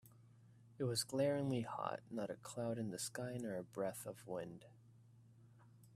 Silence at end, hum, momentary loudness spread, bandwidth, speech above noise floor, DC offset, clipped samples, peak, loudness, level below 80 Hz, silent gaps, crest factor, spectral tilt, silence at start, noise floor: 0 s; none; 10 LU; 15 kHz; 22 dB; under 0.1%; under 0.1%; -26 dBFS; -43 LUFS; -78 dBFS; none; 20 dB; -5 dB/octave; 0.05 s; -65 dBFS